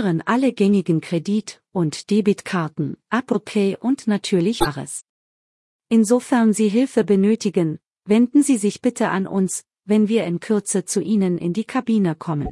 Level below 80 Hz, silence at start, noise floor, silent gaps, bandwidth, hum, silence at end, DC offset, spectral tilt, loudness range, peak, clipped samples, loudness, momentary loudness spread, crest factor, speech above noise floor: -50 dBFS; 0 s; under -90 dBFS; 5.09-5.79 s; 12 kHz; none; 0 s; under 0.1%; -6 dB/octave; 4 LU; -4 dBFS; under 0.1%; -20 LUFS; 8 LU; 16 dB; over 71 dB